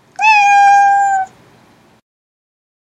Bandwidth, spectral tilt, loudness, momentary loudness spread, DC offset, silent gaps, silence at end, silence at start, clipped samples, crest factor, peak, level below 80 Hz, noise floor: 10 kHz; 0.5 dB/octave; -9 LUFS; 10 LU; under 0.1%; none; 1.75 s; 0.2 s; under 0.1%; 14 dB; 0 dBFS; -66 dBFS; -48 dBFS